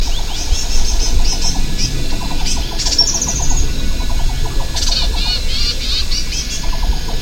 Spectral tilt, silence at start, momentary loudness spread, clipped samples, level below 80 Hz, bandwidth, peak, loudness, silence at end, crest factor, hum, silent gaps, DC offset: -2.5 dB/octave; 0 s; 7 LU; under 0.1%; -16 dBFS; 16 kHz; 0 dBFS; -18 LUFS; 0 s; 12 dB; none; none; under 0.1%